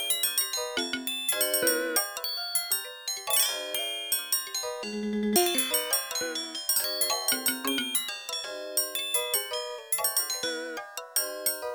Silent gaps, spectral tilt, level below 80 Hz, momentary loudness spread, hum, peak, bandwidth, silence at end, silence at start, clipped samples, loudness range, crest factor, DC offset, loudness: none; -0.5 dB/octave; -70 dBFS; 9 LU; none; -8 dBFS; over 20 kHz; 0 s; 0 s; under 0.1%; 2 LU; 22 dB; under 0.1%; -27 LUFS